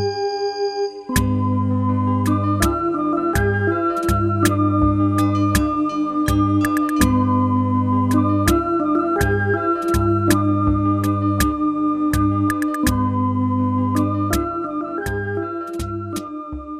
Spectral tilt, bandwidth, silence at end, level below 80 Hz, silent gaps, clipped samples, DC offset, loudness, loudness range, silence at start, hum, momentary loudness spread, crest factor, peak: -6.5 dB/octave; 14 kHz; 0 s; -32 dBFS; none; under 0.1%; under 0.1%; -19 LUFS; 3 LU; 0 s; none; 7 LU; 16 dB; -2 dBFS